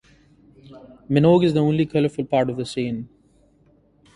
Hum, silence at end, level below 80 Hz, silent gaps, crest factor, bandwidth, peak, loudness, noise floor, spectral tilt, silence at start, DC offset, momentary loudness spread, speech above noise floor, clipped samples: none; 1.1 s; -54 dBFS; none; 20 dB; 11 kHz; -2 dBFS; -20 LUFS; -58 dBFS; -8 dB/octave; 0.7 s; under 0.1%; 12 LU; 38 dB; under 0.1%